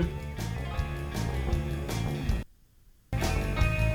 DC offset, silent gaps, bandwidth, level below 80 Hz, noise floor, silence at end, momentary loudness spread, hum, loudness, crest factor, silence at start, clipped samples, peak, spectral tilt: under 0.1%; none; 19 kHz; -34 dBFS; -58 dBFS; 0 s; 7 LU; none; -32 LUFS; 18 dB; 0 s; under 0.1%; -12 dBFS; -6 dB/octave